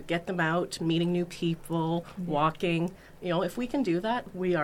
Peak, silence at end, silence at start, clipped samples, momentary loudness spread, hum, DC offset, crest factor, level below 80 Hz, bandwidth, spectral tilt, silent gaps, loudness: -14 dBFS; 0 s; 0 s; under 0.1%; 5 LU; none; under 0.1%; 16 dB; -54 dBFS; 15.5 kHz; -6.5 dB/octave; none; -30 LUFS